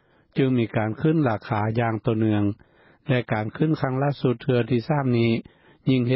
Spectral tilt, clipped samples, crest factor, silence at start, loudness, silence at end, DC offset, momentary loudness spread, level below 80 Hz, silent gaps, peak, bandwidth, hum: -12 dB/octave; under 0.1%; 14 dB; 0.35 s; -24 LUFS; 0 s; under 0.1%; 6 LU; -54 dBFS; none; -8 dBFS; 5.8 kHz; none